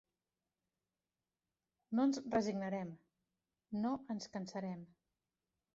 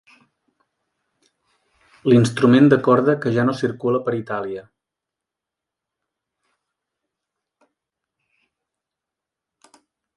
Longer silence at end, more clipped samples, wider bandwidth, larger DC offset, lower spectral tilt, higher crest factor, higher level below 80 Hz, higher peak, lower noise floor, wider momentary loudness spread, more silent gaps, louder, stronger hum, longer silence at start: second, 0.9 s vs 5.55 s; neither; second, 7.6 kHz vs 11.5 kHz; neither; second, -6 dB/octave vs -7.5 dB/octave; about the same, 20 dB vs 20 dB; second, -78 dBFS vs -62 dBFS; second, -22 dBFS vs -2 dBFS; first, under -90 dBFS vs -85 dBFS; about the same, 13 LU vs 14 LU; neither; second, -40 LUFS vs -18 LUFS; neither; second, 1.9 s vs 2.05 s